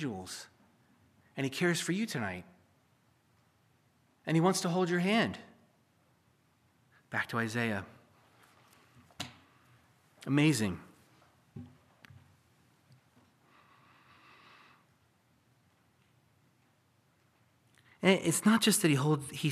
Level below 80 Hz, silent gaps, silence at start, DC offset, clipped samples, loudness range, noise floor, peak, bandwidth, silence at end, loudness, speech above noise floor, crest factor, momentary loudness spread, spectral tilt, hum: -76 dBFS; none; 0 s; under 0.1%; under 0.1%; 8 LU; -70 dBFS; -12 dBFS; 15 kHz; 0 s; -31 LUFS; 40 dB; 24 dB; 21 LU; -4.5 dB/octave; none